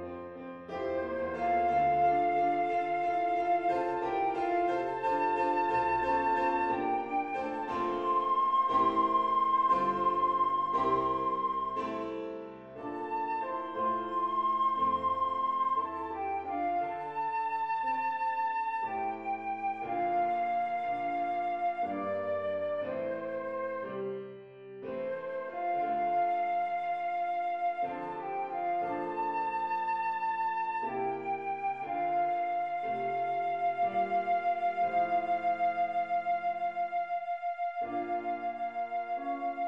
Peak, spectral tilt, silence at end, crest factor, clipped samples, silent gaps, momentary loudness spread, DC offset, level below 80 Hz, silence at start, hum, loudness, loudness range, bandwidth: -16 dBFS; -6.5 dB/octave; 0 s; 16 dB; under 0.1%; none; 8 LU; under 0.1%; -66 dBFS; 0 s; none; -32 LUFS; 5 LU; 7.6 kHz